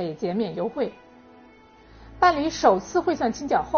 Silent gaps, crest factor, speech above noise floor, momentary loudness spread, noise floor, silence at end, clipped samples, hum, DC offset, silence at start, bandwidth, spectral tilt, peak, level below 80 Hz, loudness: none; 20 dB; 28 dB; 8 LU; -51 dBFS; 0 s; under 0.1%; none; under 0.1%; 0 s; 6.8 kHz; -4 dB/octave; -4 dBFS; -52 dBFS; -24 LUFS